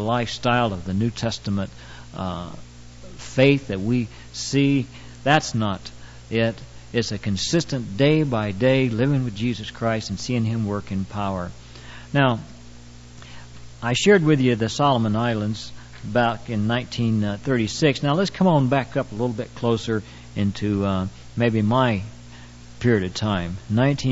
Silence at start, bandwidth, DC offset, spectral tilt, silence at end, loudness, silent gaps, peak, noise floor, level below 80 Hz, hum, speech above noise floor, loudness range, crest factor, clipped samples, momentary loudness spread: 0 s; 8 kHz; under 0.1%; -6 dB/octave; 0 s; -22 LUFS; none; -2 dBFS; -42 dBFS; -48 dBFS; 60 Hz at -45 dBFS; 20 dB; 4 LU; 20 dB; under 0.1%; 17 LU